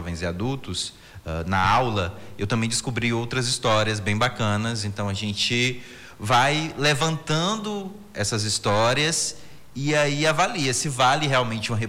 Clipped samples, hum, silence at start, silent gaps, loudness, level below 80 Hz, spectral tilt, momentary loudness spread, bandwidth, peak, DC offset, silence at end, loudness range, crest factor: under 0.1%; none; 0 s; none; -23 LUFS; -50 dBFS; -4 dB/octave; 12 LU; 16.5 kHz; -8 dBFS; under 0.1%; 0 s; 2 LU; 14 dB